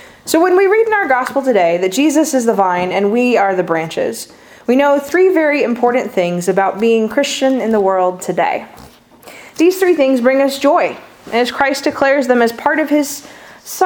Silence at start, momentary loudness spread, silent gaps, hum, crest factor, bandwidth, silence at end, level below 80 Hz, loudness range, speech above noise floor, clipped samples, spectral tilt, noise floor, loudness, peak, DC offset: 0.25 s; 8 LU; none; none; 14 dB; over 20 kHz; 0 s; -56 dBFS; 2 LU; 27 dB; under 0.1%; -4 dB/octave; -40 dBFS; -14 LUFS; 0 dBFS; under 0.1%